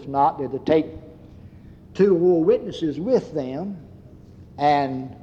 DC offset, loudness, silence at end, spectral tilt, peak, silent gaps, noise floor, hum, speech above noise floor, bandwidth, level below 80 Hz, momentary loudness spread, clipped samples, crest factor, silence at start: under 0.1%; -21 LUFS; 0.05 s; -8 dB/octave; -6 dBFS; none; -45 dBFS; none; 24 dB; 7.4 kHz; -54 dBFS; 16 LU; under 0.1%; 16 dB; 0 s